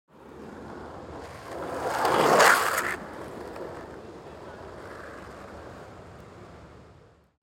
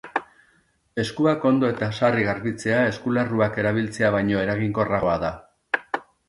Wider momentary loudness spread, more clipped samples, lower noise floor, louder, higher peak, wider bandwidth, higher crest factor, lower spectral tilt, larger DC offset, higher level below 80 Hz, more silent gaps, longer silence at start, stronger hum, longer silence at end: first, 27 LU vs 9 LU; neither; second, -55 dBFS vs -63 dBFS; about the same, -23 LUFS vs -23 LUFS; about the same, -4 dBFS vs -4 dBFS; first, 17 kHz vs 11.5 kHz; first, 26 dB vs 18 dB; second, -2.5 dB/octave vs -6.5 dB/octave; neither; about the same, -56 dBFS vs -52 dBFS; neither; first, 0.2 s vs 0.05 s; neither; first, 0.6 s vs 0.25 s